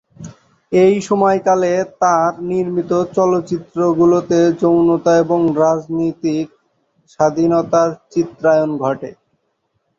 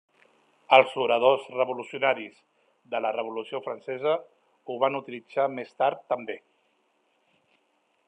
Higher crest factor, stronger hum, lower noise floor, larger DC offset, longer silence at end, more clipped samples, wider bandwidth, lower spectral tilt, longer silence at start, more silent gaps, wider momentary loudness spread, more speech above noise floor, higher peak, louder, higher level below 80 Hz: second, 14 dB vs 26 dB; neither; second, -67 dBFS vs -71 dBFS; neither; second, 0.85 s vs 1.7 s; neither; second, 7.8 kHz vs 9.8 kHz; first, -7 dB/octave vs -5 dB/octave; second, 0.2 s vs 0.7 s; neither; second, 7 LU vs 15 LU; first, 53 dB vs 45 dB; about the same, -2 dBFS vs -2 dBFS; first, -15 LUFS vs -26 LUFS; first, -56 dBFS vs -86 dBFS